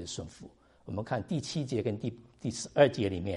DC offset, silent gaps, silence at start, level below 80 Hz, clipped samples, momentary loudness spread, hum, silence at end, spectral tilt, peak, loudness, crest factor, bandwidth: under 0.1%; none; 0 s; -60 dBFS; under 0.1%; 15 LU; none; 0 s; -5.5 dB/octave; -10 dBFS; -32 LUFS; 22 dB; 11.5 kHz